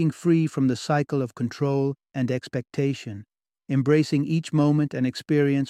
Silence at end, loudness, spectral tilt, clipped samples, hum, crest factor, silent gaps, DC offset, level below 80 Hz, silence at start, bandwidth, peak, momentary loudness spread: 0 s; -24 LUFS; -7.5 dB/octave; under 0.1%; none; 16 dB; none; under 0.1%; -64 dBFS; 0 s; 12 kHz; -8 dBFS; 8 LU